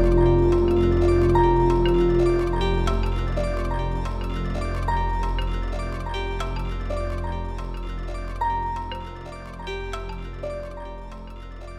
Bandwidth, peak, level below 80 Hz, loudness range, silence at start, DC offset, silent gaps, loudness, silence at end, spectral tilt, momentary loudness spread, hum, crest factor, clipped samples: 10 kHz; -6 dBFS; -28 dBFS; 10 LU; 0 s; under 0.1%; none; -24 LUFS; 0 s; -7.5 dB/octave; 17 LU; none; 16 dB; under 0.1%